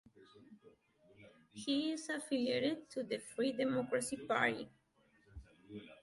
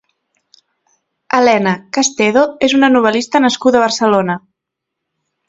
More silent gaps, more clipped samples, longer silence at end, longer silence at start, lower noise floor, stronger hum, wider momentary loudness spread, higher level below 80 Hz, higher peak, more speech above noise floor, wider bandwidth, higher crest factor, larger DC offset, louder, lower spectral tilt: neither; neither; second, 0.1 s vs 1.1 s; second, 0.2 s vs 1.35 s; second, -72 dBFS vs -79 dBFS; neither; first, 22 LU vs 6 LU; second, -68 dBFS vs -56 dBFS; second, -20 dBFS vs 0 dBFS; second, 34 dB vs 66 dB; first, 11.5 kHz vs 8 kHz; first, 22 dB vs 14 dB; neither; second, -38 LUFS vs -13 LUFS; about the same, -4 dB/octave vs -4 dB/octave